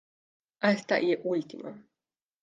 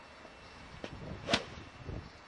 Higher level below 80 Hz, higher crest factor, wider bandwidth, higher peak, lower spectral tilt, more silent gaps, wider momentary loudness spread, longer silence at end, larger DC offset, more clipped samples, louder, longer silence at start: second, -84 dBFS vs -56 dBFS; second, 20 dB vs 30 dB; second, 9.2 kHz vs 11.5 kHz; about the same, -12 dBFS vs -12 dBFS; first, -6 dB/octave vs -4 dB/octave; neither; about the same, 16 LU vs 18 LU; first, 0.65 s vs 0 s; neither; neither; first, -28 LUFS vs -39 LUFS; first, 0.6 s vs 0 s